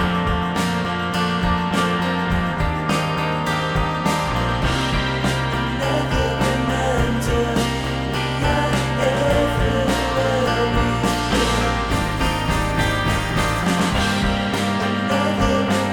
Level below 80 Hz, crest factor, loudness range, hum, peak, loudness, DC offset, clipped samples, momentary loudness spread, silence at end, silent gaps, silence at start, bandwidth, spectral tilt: -30 dBFS; 14 dB; 1 LU; none; -6 dBFS; -20 LUFS; 0.2%; under 0.1%; 3 LU; 0 s; none; 0 s; 19.5 kHz; -5 dB/octave